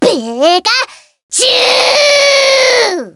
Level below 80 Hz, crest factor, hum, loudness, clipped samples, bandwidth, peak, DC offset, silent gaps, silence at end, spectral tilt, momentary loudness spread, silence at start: -60 dBFS; 10 dB; none; -8 LUFS; 0.1%; over 20 kHz; 0 dBFS; under 0.1%; 1.23-1.29 s; 0.05 s; -0.5 dB/octave; 6 LU; 0 s